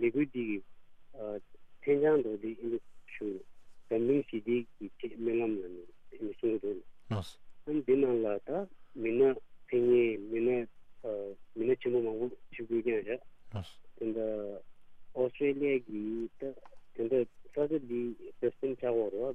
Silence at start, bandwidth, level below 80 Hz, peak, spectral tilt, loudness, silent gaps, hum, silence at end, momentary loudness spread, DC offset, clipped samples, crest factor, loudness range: 0 s; 5.6 kHz; -64 dBFS; -16 dBFS; -8.5 dB/octave; -34 LUFS; none; none; 0 s; 16 LU; under 0.1%; under 0.1%; 18 dB; 5 LU